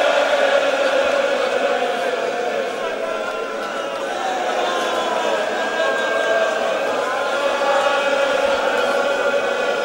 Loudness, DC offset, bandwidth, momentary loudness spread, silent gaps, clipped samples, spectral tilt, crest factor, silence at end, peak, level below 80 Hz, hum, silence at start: -19 LUFS; under 0.1%; 16 kHz; 7 LU; none; under 0.1%; -2 dB/octave; 16 dB; 0 s; -4 dBFS; -60 dBFS; none; 0 s